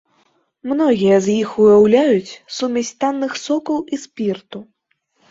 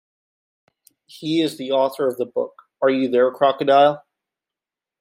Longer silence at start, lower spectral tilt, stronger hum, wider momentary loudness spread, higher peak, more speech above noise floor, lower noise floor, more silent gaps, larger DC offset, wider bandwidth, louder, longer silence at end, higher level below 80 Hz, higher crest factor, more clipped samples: second, 0.65 s vs 1.2 s; about the same, -5.5 dB/octave vs -5.5 dB/octave; neither; first, 17 LU vs 12 LU; about the same, -2 dBFS vs -4 dBFS; second, 51 dB vs 70 dB; second, -67 dBFS vs -88 dBFS; neither; neither; second, 7.8 kHz vs 16 kHz; first, -16 LUFS vs -19 LUFS; second, 0.7 s vs 1 s; first, -58 dBFS vs -74 dBFS; about the same, 14 dB vs 18 dB; neither